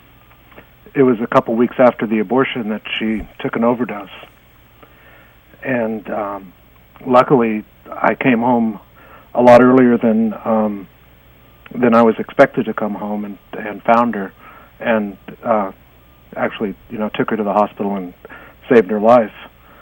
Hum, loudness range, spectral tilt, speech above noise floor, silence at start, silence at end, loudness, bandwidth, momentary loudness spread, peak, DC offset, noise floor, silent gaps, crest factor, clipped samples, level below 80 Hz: none; 9 LU; -7.5 dB/octave; 32 dB; 0.95 s; 0.35 s; -16 LUFS; 16.5 kHz; 16 LU; 0 dBFS; under 0.1%; -47 dBFS; none; 16 dB; 0.1%; -50 dBFS